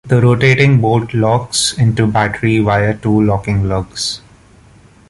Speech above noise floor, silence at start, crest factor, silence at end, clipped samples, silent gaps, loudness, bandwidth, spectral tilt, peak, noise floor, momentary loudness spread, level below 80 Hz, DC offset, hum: 31 dB; 0.05 s; 14 dB; 0.9 s; under 0.1%; none; -13 LUFS; 11.5 kHz; -5.5 dB/octave; 0 dBFS; -44 dBFS; 8 LU; -36 dBFS; under 0.1%; none